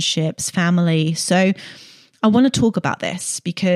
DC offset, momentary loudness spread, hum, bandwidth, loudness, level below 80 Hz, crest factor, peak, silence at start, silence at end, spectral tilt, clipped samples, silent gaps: under 0.1%; 8 LU; none; 13.5 kHz; -18 LUFS; -56 dBFS; 14 dB; -4 dBFS; 0 s; 0 s; -5 dB/octave; under 0.1%; none